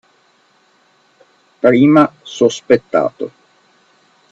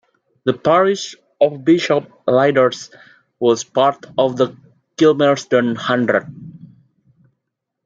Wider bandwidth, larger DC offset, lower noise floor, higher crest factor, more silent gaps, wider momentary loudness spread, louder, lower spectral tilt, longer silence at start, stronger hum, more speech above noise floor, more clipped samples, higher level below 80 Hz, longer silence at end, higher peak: about the same, 8 kHz vs 7.8 kHz; neither; second, -55 dBFS vs -77 dBFS; about the same, 16 dB vs 16 dB; neither; about the same, 13 LU vs 11 LU; first, -13 LUFS vs -17 LUFS; about the same, -6 dB/octave vs -5.5 dB/octave; first, 1.65 s vs 0.45 s; neither; second, 43 dB vs 61 dB; neither; about the same, -60 dBFS vs -64 dBFS; second, 1.05 s vs 1.3 s; about the same, 0 dBFS vs -2 dBFS